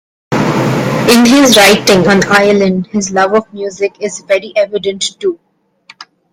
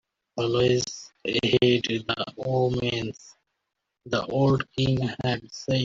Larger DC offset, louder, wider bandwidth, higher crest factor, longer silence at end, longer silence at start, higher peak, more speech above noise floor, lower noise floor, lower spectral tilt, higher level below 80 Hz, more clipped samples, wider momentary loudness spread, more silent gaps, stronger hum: neither; first, -10 LUFS vs -25 LUFS; first, 17 kHz vs 7.6 kHz; second, 10 dB vs 20 dB; first, 0.3 s vs 0 s; about the same, 0.3 s vs 0.35 s; first, 0 dBFS vs -6 dBFS; second, 33 dB vs 57 dB; second, -43 dBFS vs -82 dBFS; second, -4 dB/octave vs -5.5 dB/octave; first, -46 dBFS vs -54 dBFS; first, 0.1% vs under 0.1%; first, 13 LU vs 10 LU; neither; neither